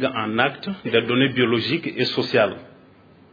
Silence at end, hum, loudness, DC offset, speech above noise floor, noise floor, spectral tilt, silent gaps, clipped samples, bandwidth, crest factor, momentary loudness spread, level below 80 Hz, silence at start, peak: 0.65 s; none; -21 LUFS; under 0.1%; 29 dB; -50 dBFS; -7 dB/octave; none; under 0.1%; 5 kHz; 20 dB; 5 LU; -64 dBFS; 0 s; -2 dBFS